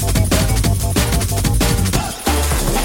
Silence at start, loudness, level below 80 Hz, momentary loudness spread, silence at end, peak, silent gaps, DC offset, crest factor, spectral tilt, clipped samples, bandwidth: 0 s; -17 LUFS; -20 dBFS; 3 LU; 0 s; 0 dBFS; none; under 0.1%; 14 dB; -4.5 dB/octave; under 0.1%; 17.5 kHz